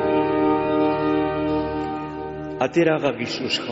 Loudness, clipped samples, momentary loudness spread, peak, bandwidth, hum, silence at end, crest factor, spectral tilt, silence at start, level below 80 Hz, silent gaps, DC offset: -22 LUFS; under 0.1%; 10 LU; -6 dBFS; 8 kHz; none; 0 s; 16 dB; -4 dB/octave; 0 s; -46 dBFS; none; under 0.1%